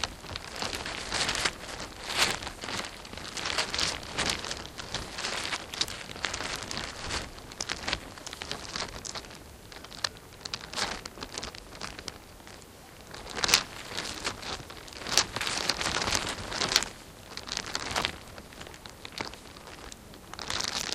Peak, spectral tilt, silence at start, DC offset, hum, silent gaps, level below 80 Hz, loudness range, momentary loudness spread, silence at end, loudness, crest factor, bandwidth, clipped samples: 0 dBFS; -1 dB/octave; 0 s; under 0.1%; none; none; -52 dBFS; 7 LU; 18 LU; 0 s; -32 LUFS; 34 dB; 16 kHz; under 0.1%